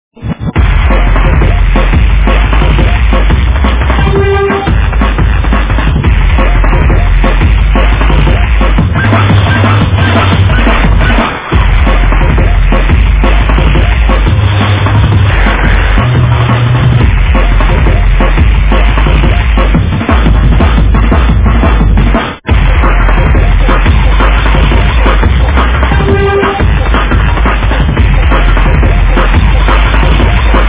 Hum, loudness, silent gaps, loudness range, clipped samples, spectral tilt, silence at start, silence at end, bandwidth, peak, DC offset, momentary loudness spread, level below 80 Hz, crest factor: none; -8 LUFS; none; 1 LU; 2%; -10.5 dB/octave; 0.2 s; 0 s; 4 kHz; 0 dBFS; under 0.1%; 2 LU; -8 dBFS; 6 dB